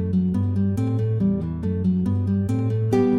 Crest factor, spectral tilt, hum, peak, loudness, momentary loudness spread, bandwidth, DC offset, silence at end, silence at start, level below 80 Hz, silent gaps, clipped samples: 12 dB; -10 dB/octave; none; -8 dBFS; -23 LUFS; 2 LU; 9.8 kHz; under 0.1%; 0 s; 0 s; -48 dBFS; none; under 0.1%